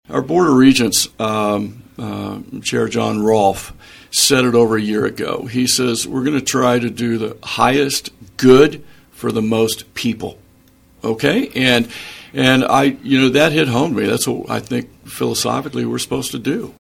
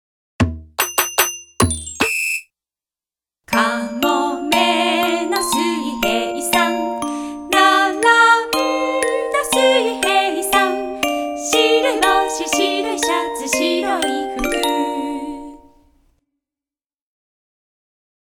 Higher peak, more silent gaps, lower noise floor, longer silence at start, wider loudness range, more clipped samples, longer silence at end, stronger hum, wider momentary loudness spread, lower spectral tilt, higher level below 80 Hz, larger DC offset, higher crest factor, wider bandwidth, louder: about the same, 0 dBFS vs 0 dBFS; neither; second, -50 dBFS vs under -90 dBFS; second, 0.1 s vs 0.4 s; second, 4 LU vs 7 LU; neither; second, 0.15 s vs 2.75 s; neither; first, 14 LU vs 8 LU; about the same, -4 dB/octave vs -3 dB/octave; about the same, -48 dBFS vs -44 dBFS; neither; about the same, 16 dB vs 18 dB; about the same, 17 kHz vs 18 kHz; about the same, -16 LUFS vs -17 LUFS